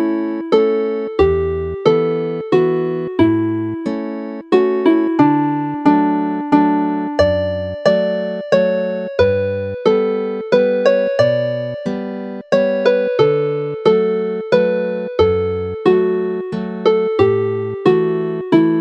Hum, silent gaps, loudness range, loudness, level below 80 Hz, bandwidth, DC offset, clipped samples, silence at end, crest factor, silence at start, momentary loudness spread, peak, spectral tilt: none; none; 1 LU; -16 LUFS; -42 dBFS; 8.2 kHz; under 0.1%; under 0.1%; 0 s; 16 dB; 0 s; 7 LU; 0 dBFS; -8 dB/octave